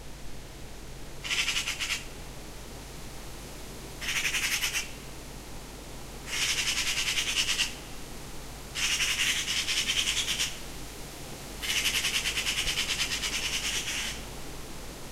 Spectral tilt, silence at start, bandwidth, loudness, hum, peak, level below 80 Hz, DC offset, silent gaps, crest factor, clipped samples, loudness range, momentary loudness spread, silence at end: -0.5 dB/octave; 0 s; 16 kHz; -28 LUFS; none; -10 dBFS; -46 dBFS; under 0.1%; none; 22 dB; under 0.1%; 5 LU; 18 LU; 0 s